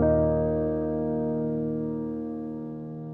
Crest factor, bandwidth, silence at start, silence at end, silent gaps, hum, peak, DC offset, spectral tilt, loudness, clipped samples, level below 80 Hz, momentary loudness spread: 16 dB; 3 kHz; 0 s; 0 s; none; none; -12 dBFS; under 0.1%; -12.5 dB/octave; -28 LUFS; under 0.1%; -46 dBFS; 12 LU